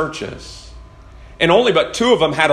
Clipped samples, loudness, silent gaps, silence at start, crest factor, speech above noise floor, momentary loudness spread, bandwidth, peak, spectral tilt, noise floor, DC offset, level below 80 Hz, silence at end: under 0.1%; -15 LUFS; none; 0 s; 18 dB; 24 dB; 21 LU; 12.5 kHz; 0 dBFS; -4 dB/octave; -40 dBFS; under 0.1%; -42 dBFS; 0 s